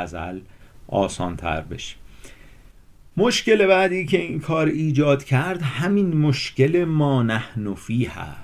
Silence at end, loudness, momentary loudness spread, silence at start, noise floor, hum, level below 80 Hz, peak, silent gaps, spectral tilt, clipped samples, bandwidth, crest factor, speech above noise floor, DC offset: 0 s; -21 LUFS; 13 LU; 0 s; -47 dBFS; none; -46 dBFS; -4 dBFS; none; -6 dB/octave; under 0.1%; 14 kHz; 18 dB; 27 dB; under 0.1%